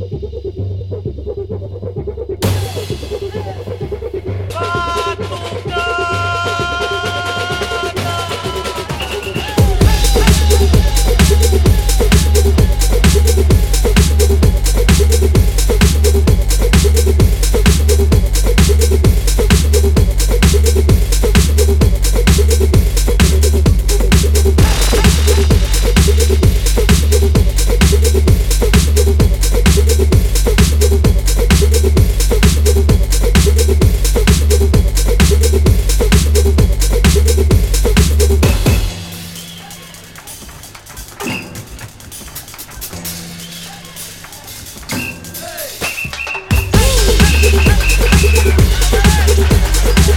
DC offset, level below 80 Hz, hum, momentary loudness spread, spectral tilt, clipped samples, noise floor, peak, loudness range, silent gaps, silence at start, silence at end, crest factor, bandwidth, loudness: under 0.1%; -14 dBFS; none; 14 LU; -5 dB/octave; under 0.1%; -34 dBFS; 0 dBFS; 11 LU; none; 0 s; 0 s; 12 dB; 18 kHz; -13 LUFS